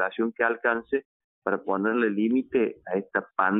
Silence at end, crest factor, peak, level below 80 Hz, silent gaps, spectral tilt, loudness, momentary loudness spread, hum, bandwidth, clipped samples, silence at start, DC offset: 0 s; 18 dB; -10 dBFS; -68 dBFS; 1.05-1.42 s; -4.5 dB/octave; -27 LUFS; 7 LU; none; 4 kHz; under 0.1%; 0 s; under 0.1%